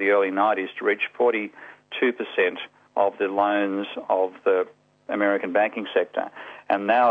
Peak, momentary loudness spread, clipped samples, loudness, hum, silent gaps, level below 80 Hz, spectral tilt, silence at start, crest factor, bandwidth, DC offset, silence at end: -6 dBFS; 10 LU; under 0.1%; -24 LUFS; none; none; -74 dBFS; -6.5 dB/octave; 0 s; 16 dB; 4.9 kHz; under 0.1%; 0 s